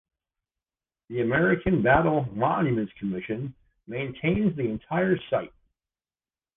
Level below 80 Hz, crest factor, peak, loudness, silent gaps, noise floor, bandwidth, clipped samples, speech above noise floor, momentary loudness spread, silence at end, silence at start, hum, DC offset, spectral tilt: -50 dBFS; 20 dB; -8 dBFS; -26 LUFS; none; under -90 dBFS; 3.8 kHz; under 0.1%; over 65 dB; 13 LU; 1.1 s; 1.1 s; none; under 0.1%; -10.5 dB/octave